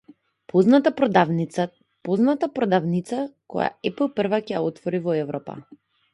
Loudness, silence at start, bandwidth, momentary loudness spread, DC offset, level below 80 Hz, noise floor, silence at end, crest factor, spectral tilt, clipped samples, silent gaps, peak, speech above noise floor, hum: -23 LUFS; 0.55 s; 11.5 kHz; 12 LU; under 0.1%; -66 dBFS; -49 dBFS; 0.5 s; 22 dB; -7.5 dB/octave; under 0.1%; none; -2 dBFS; 28 dB; none